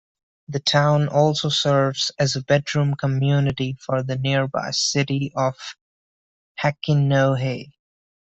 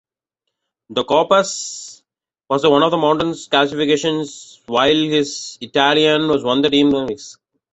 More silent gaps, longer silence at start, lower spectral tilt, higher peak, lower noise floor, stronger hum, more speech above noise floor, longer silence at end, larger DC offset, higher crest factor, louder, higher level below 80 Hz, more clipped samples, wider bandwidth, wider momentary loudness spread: first, 5.81-6.55 s vs none; second, 0.5 s vs 0.9 s; about the same, -5 dB/octave vs -4 dB/octave; about the same, -4 dBFS vs -2 dBFS; first, under -90 dBFS vs -79 dBFS; neither; first, over 70 dB vs 63 dB; first, 0.65 s vs 0.4 s; neither; about the same, 18 dB vs 16 dB; second, -21 LUFS vs -16 LUFS; about the same, -56 dBFS vs -56 dBFS; neither; about the same, 8.2 kHz vs 8.2 kHz; second, 8 LU vs 14 LU